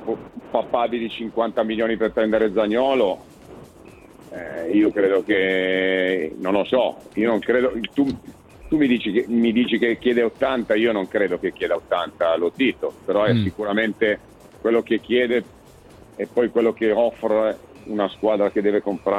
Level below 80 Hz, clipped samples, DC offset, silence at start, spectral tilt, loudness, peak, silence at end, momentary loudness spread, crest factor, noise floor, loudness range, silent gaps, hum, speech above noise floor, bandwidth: -54 dBFS; under 0.1%; under 0.1%; 0 s; -7 dB/octave; -21 LUFS; -6 dBFS; 0 s; 7 LU; 16 dB; -46 dBFS; 2 LU; none; none; 26 dB; 12.5 kHz